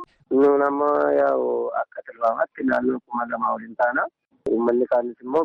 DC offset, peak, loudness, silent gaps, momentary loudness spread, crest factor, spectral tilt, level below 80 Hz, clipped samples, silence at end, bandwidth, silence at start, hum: under 0.1%; -10 dBFS; -22 LUFS; none; 9 LU; 12 dB; -8 dB/octave; -64 dBFS; under 0.1%; 0 s; 5.8 kHz; 0 s; none